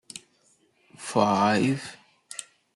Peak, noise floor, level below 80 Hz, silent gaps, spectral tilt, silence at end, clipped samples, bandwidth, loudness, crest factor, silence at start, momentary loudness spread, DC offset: -6 dBFS; -65 dBFS; -70 dBFS; none; -5 dB/octave; 0.35 s; under 0.1%; 12 kHz; -24 LUFS; 22 dB; 0.15 s; 21 LU; under 0.1%